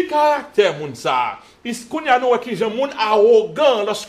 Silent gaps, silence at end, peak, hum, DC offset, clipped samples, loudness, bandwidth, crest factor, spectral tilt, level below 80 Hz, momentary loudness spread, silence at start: none; 0 s; -2 dBFS; none; under 0.1%; under 0.1%; -17 LUFS; 14 kHz; 16 dB; -4 dB/octave; -62 dBFS; 12 LU; 0 s